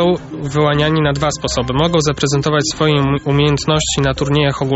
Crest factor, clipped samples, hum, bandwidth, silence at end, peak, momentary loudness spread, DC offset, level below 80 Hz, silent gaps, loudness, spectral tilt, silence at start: 14 dB; under 0.1%; none; 8.2 kHz; 0 s; -2 dBFS; 3 LU; under 0.1%; -34 dBFS; none; -15 LUFS; -5 dB/octave; 0 s